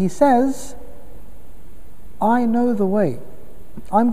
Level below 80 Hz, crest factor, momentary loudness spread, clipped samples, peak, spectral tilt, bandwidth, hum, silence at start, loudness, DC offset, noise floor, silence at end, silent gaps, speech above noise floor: -46 dBFS; 18 dB; 15 LU; under 0.1%; -2 dBFS; -7 dB/octave; 15.5 kHz; none; 0 s; -19 LUFS; 6%; -43 dBFS; 0 s; none; 26 dB